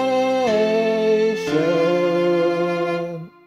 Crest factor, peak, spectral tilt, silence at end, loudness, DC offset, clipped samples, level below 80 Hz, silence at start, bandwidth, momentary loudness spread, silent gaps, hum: 12 dB; -6 dBFS; -6 dB/octave; 0.15 s; -19 LUFS; under 0.1%; under 0.1%; -60 dBFS; 0 s; 13 kHz; 5 LU; none; none